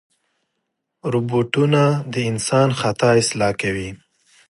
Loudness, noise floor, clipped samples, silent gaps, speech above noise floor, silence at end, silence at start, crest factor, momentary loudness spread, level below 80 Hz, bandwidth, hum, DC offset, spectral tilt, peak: -19 LUFS; -76 dBFS; under 0.1%; none; 58 dB; 0.55 s; 1.05 s; 16 dB; 8 LU; -52 dBFS; 11.5 kHz; none; under 0.1%; -5.5 dB/octave; -4 dBFS